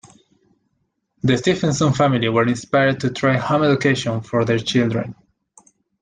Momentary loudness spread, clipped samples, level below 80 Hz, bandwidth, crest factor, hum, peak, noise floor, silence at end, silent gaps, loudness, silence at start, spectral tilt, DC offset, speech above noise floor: 5 LU; under 0.1%; -54 dBFS; 9.6 kHz; 16 dB; none; -4 dBFS; -71 dBFS; 0.9 s; none; -18 LUFS; 1.25 s; -6 dB/octave; under 0.1%; 53 dB